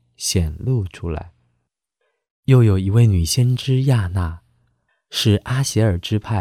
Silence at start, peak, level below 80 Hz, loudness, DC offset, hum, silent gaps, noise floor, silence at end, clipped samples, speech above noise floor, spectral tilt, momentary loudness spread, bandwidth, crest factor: 0.2 s; -4 dBFS; -36 dBFS; -19 LUFS; under 0.1%; none; 2.31-2.43 s; -73 dBFS; 0 s; under 0.1%; 55 dB; -5.5 dB/octave; 12 LU; 14.5 kHz; 16 dB